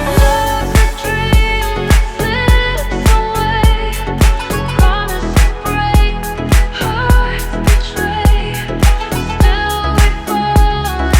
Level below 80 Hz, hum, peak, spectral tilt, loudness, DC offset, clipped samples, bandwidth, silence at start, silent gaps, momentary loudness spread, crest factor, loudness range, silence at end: -14 dBFS; none; 0 dBFS; -5 dB/octave; -14 LUFS; under 0.1%; under 0.1%; 17 kHz; 0 s; none; 5 LU; 12 dB; 1 LU; 0 s